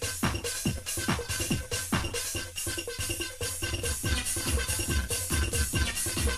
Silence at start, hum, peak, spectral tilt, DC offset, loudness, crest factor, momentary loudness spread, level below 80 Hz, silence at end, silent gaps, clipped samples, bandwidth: 0 s; none; -12 dBFS; -3 dB/octave; under 0.1%; -30 LUFS; 18 dB; 4 LU; -36 dBFS; 0 s; none; under 0.1%; 14.5 kHz